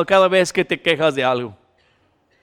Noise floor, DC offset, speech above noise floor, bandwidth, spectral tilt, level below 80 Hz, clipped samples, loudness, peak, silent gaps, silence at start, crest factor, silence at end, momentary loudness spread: -61 dBFS; under 0.1%; 44 dB; 14 kHz; -4 dB/octave; -56 dBFS; under 0.1%; -17 LUFS; -2 dBFS; none; 0 s; 16 dB; 0.9 s; 9 LU